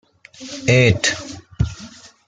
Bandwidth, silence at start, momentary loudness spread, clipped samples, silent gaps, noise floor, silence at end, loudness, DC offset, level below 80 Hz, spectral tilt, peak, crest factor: 9.4 kHz; 0.4 s; 23 LU; under 0.1%; none; -41 dBFS; 0.4 s; -18 LUFS; under 0.1%; -38 dBFS; -4.5 dB/octave; -2 dBFS; 18 dB